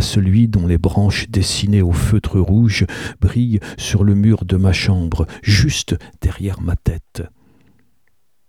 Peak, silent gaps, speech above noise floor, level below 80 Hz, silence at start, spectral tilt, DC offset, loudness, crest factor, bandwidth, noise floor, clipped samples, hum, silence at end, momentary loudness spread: 0 dBFS; none; 52 dB; -28 dBFS; 0 s; -6 dB/octave; 0.2%; -16 LUFS; 14 dB; 14 kHz; -67 dBFS; under 0.1%; none; 1.2 s; 9 LU